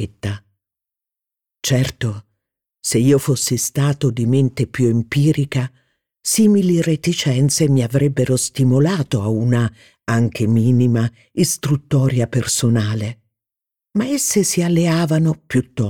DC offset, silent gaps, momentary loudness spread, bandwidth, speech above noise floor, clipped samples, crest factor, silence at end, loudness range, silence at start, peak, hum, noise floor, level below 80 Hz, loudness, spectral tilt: 0.2%; none; 10 LU; 18 kHz; 70 dB; under 0.1%; 14 dB; 0 s; 3 LU; 0 s; -4 dBFS; none; -86 dBFS; -50 dBFS; -17 LUFS; -5.5 dB/octave